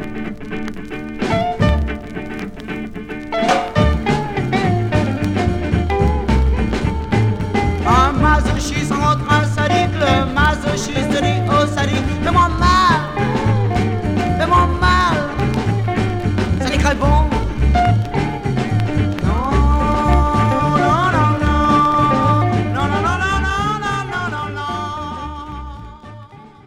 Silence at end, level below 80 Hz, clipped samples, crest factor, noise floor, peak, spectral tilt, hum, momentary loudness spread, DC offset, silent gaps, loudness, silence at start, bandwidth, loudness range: 0.2 s; -24 dBFS; under 0.1%; 16 dB; -39 dBFS; 0 dBFS; -6 dB/octave; none; 13 LU; under 0.1%; none; -17 LUFS; 0 s; 12 kHz; 4 LU